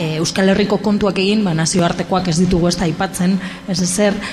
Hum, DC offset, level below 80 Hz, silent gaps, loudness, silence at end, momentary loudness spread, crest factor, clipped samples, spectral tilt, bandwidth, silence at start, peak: none; under 0.1%; -38 dBFS; none; -16 LUFS; 0 s; 4 LU; 12 dB; under 0.1%; -5 dB/octave; 14.5 kHz; 0 s; -4 dBFS